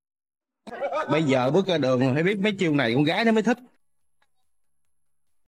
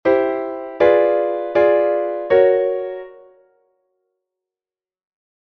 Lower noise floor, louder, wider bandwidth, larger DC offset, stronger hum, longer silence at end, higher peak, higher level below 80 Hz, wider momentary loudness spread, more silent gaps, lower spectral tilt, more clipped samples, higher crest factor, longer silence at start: second, -82 dBFS vs under -90 dBFS; second, -23 LUFS vs -17 LUFS; first, 12 kHz vs 5.6 kHz; neither; neither; second, 1.9 s vs 2.3 s; second, -10 dBFS vs -2 dBFS; second, -70 dBFS vs -58 dBFS; second, 8 LU vs 12 LU; neither; about the same, -6.5 dB/octave vs -7.5 dB/octave; neither; about the same, 16 dB vs 16 dB; first, 0.65 s vs 0.05 s